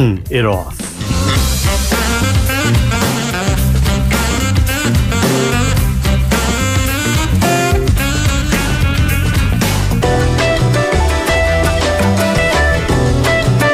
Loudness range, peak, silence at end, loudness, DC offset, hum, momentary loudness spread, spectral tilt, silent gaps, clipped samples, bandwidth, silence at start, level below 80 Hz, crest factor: 1 LU; 0 dBFS; 0 s; -14 LUFS; under 0.1%; none; 2 LU; -5 dB/octave; none; under 0.1%; 16 kHz; 0 s; -18 dBFS; 12 dB